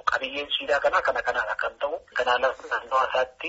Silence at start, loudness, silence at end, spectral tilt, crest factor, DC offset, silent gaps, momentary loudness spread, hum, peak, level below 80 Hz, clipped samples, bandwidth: 0.05 s; -25 LUFS; 0 s; 2 dB/octave; 18 dB; under 0.1%; none; 6 LU; none; -8 dBFS; -58 dBFS; under 0.1%; 8 kHz